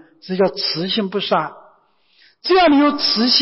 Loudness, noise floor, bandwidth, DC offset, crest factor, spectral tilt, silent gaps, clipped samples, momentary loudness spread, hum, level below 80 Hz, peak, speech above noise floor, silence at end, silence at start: -16 LUFS; -57 dBFS; 6 kHz; under 0.1%; 16 dB; -7 dB/octave; none; under 0.1%; 12 LU; none; -56 dBFS; -2 dBFS; 40 dB; 0 s; 0.25 s